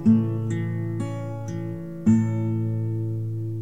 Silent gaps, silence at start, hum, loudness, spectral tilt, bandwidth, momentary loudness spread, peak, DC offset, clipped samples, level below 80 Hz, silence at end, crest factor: none; 0 s; none; -26 LUFS; -9.5 dB/octave; 8.8 kHz; 11 LU; -8 dBFS; 0.6%; under 0.1%; -56 dBFS; 0 s; 16 dB